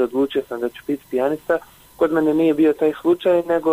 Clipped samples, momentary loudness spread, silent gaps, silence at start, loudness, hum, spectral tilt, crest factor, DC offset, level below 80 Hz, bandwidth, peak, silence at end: under 0.1%; 8 LU; none; 0 s; -20 LUFS; none; -6.5 dB/octave; 12 dB; under 0.1%; -56 dBFS; 16 kHz; -8 dBFS; 0 s